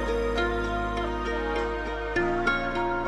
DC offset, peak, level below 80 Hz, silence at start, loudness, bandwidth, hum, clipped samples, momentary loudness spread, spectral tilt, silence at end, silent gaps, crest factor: under 0.1%; -12 dBFS; -36 dBFS; 0 s; -28 LUFS; 12 kHz; none; under 0.1%; 4 LU; -6 dB/octave; 0 s; none; 16 dB